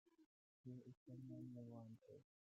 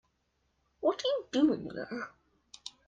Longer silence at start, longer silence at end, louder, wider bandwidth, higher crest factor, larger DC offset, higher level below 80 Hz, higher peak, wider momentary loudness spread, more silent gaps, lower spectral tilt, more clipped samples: second, 0.05 s vs 0.8 s; about the same, 0.25 s vs 0.2 s; second, -59 LUFS vs -32 LUFS; second, 7.6 kHz vs 9.2 kHz; second, 14 dB vs 20 dB; neither; second, under -90 dBFS vs -70 dBFS; second, -46 dBFS vs -16 dBFS; second, 8 LU vs 17 LU; first, 0.26-0.64 s, 0.97-1.06 s vs none; first, -11 dB/octave vs -4.5 dB/octave; neither